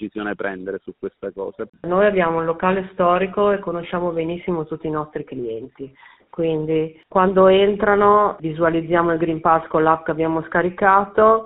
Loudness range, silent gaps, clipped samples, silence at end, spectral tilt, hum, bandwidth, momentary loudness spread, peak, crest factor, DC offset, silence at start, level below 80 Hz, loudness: 8 LU; 1.69-1.73 s; under 0.1%; 0 s; -5 dB/octave; none; 4 kHz; 16 LU; -2 dBFS; 18 dB; under 0.1%; 0 s; -50 dBFS; -19 LUFS